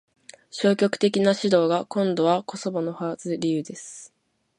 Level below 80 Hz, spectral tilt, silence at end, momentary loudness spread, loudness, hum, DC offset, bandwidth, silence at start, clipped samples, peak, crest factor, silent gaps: -72 dBFS; -5.5 dB/octave; 0.5 s; 16 LU; -23 LUFS; none; under 0.1%; 11 kHz; 0.55 s; under 0.1%; -6 dBFS; 18 dB; none